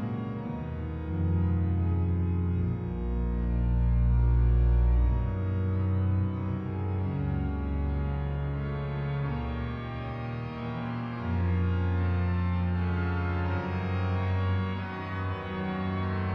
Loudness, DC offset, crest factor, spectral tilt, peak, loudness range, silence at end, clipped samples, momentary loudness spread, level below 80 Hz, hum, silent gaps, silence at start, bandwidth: -30 LUFS; under 0.1%; 12 dB; -10 dB/octave; -16 dBFS; 5 LU; 0 s; under 0.1%; 9 LU; -32 dBFS; none; none; 0 s; 5 kHz